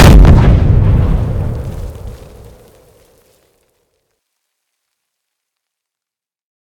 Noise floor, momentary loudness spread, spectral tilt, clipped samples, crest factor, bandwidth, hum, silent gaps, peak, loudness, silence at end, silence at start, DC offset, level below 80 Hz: -87 dBFS; 25 LU; -7 dB/octave; 3%; 12 dB; 16 kHz; none; none; 0 dBFS; -10 LUFS; 4.55 s; 0 s; under 0.1%; -16 dBFS